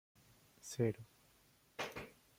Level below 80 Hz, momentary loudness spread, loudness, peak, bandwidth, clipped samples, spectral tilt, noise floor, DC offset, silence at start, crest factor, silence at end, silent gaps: -74 dBFS; 17 LU; -43 LUFS; -24 dBFS; 16.5 kHz; under 0.1%; -5.5 dB/octave; -71 dBFS; under 0.1%; 0.65 s; 22 dB; 0.25 s; none